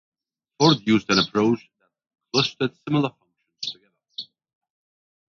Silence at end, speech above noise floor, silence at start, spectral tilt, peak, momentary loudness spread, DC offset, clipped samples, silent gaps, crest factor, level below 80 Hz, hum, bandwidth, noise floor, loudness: 1.1 s; 22 dB; 0.6 s; -5 dB/octave; -2 dBFS; 18 LU; under 0.1%; under 0.1%; none; 22 dB; -60 dBFS; none; 7.4 kHz; -42 dBFS; -22 LUFS